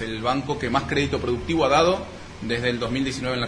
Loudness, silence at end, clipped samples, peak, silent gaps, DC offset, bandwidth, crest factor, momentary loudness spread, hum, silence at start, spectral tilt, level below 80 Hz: -23 LUFS; 0 s; under 0.1%; -6 dBFS; none; under 0.1%; 10.5 kHz; 18 dB; 9 LU; none; 0 s; -5 dB/octave; -42 dBFS